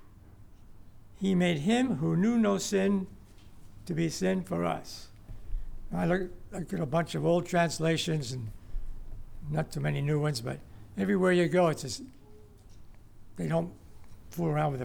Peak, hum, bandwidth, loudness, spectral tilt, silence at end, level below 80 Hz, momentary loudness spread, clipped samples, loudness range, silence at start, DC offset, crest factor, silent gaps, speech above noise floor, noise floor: -14 dBFS; none; 17.5 kHz; -30 LUFS; -6 dB/octave; 0 s; -46 dBFS; 20 LU; under 0.1%; 4 LU; 0 s; under 0.1%; 16 dB; none; 23 dB; -52 dBFS